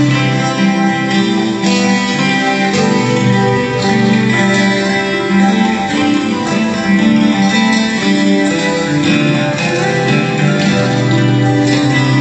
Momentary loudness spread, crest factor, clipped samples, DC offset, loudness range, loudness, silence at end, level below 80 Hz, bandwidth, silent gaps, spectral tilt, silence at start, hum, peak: 3 LU; 12 dB; under 0.1%; under 0.1%; 1 LU; -12 LUFS; 0 s; -48 dBFS; 9 kHz; none; -5.5 dB/octave; 0 s; none; 0 dBFS